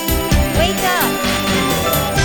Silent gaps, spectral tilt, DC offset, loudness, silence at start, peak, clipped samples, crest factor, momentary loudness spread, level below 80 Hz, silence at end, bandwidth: none; -4 dB/octave; under 0.1%; -15 LUFS; 0 s; -2 dBFS; under 0.1%; 14 dB; 1 LU; -24 dBFS; 0 s; 19.5 kHz